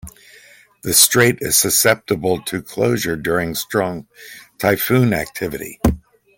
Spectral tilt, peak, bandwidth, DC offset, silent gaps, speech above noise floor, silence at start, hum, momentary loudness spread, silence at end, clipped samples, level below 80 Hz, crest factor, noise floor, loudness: -3.5 dB/octave; 0 dBFS; 17 kHz; under 0.1%; none; 30 dB; 0.05 s; none; 14 LU; 0.4 s; under 0.1%; -38 dBFS; 18 dB; -47 dBFS; -17 LUFS